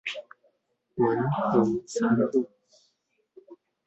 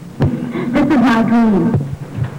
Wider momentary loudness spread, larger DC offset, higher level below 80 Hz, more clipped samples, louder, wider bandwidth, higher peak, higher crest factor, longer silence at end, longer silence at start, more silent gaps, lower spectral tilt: first, 15 LU vs 9 LU; neither; second, -66 dBFS vs -38 dBFS; neither; second, -26 LUFS vs -14 LUFS; second, 8.2 kHz vs 10.5 kHz; about the same, -8 dBFS vs -8 dBFS; first, 20 dB vs 6 dB; first, 0.35 s vs 0 s; about the same, 0.05 s vs 0 s; neither; second, -6.5 dB/octave vs -8 dB/octave